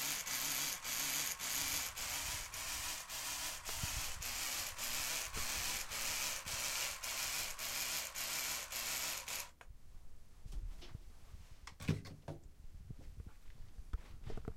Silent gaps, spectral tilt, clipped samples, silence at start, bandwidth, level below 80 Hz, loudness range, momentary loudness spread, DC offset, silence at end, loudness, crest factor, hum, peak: none; -1 dB/octave; under 0.1%; 0 s; 16.5 kHz; -54 dBFS; 11 LU; 19 LU; under 0.1%; 0 s; -39 LUFS; 22 dB; none; -20 dBFS